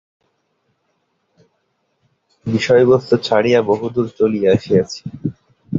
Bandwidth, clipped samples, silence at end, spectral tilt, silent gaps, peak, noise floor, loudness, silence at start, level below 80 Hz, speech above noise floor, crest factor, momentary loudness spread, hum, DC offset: 7.6 kHz; under 0.1%; 0 s; -6.5 dB/octave; none; -2 dBFS; -67 dBFS; -16 LUFS; 2.45 s; -52 dBFS; 52 dB; 16 dB; 14 LU; none; under 0.1%